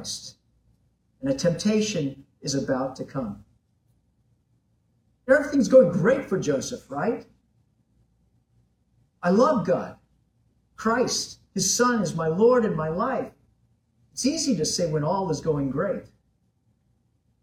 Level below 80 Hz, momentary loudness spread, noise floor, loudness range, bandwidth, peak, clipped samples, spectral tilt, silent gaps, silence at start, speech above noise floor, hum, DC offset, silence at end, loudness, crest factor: -58 dBFS; 14 LU; -68 dBFS; 6 LU; 15 kHz; -6 dBFS; under 0.1%; -4.5 dB/octave; none; 0 s; 45 dB; none; under 0.1%; 1.4 s; -24 LUFS; 20 dB